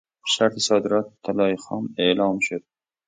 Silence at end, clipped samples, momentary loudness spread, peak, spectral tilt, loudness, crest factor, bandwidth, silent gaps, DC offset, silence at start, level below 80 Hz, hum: 0.45 s; under 0.1%; 8 LU; -4 dBFS; -3.5 dB/octave; -22 LUFS; 18 dB; 9.6 kHz; none; under 0.1%; 0.25 s; -64 dBFS; none